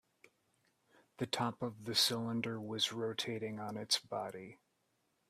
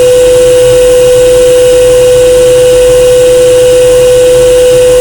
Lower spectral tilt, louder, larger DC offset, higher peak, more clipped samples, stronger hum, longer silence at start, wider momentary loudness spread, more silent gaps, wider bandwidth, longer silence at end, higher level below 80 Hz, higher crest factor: about the same, -3 dB/octave vs -3.5 dB/octave; second, -37 LUFS vs -3 LUFS; second, under 0.1% vs 0.1%; second, -18 dBFS vs 0 dBFS; second, under 0.1% vs 10%; neither; first, 1.2 s vs 0 s; first, 13 LU vs 0 LU; neither; second, 15.5 kHz vs over 20 kHz; first, 0.75 s vs 0 s; second, -78 dBFS vs -24 dBFS; first, 22 dB vs 2 dB